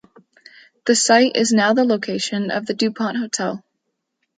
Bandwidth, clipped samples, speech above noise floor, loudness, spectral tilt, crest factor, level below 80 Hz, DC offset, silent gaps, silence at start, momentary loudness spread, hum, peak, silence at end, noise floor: 9.6 kHz; under 0.1%; 57 dB; -18 LUFS; -3 dB/octave; 18 dB; -70 dBFS; under 0.1%; none; 0.85 s; 10 LU; none; -2 dBFS; 0.8 s; -75 dBFS